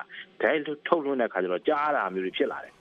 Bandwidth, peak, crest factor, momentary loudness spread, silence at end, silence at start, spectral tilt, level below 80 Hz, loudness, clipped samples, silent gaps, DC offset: 6.4 kHz; -6 dBFS; 22 dB; 4 LU; 0.1 s; 0 s; -7 dB/octave; -74 dBFS; -27 LUFS; under 0.1%; none; under 0.1%